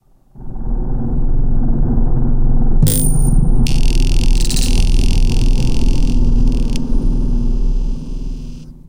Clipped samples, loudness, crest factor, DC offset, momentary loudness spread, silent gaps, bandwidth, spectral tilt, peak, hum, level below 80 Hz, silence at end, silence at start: under 0.1%; -18 LUFS; 10 dB; under 0.1%; 11 LU; none; 16.5 kHz; -5.5 dB/octave; -2 dBFS; none; -12 dBFS; 0.15 s; 0.4 s